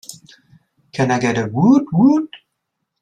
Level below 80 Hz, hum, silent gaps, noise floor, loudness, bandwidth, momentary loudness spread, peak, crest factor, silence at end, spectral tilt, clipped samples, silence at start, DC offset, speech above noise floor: -58 dBFS; none; none; -75 dBFS; -16 LUFS; 13.5 kHz; 18 LU; -2 dBFS; 16 dB; 0.65 s; -7 dB/octave; under 0.1%; 0.1 s; under 0.1%; 60 dB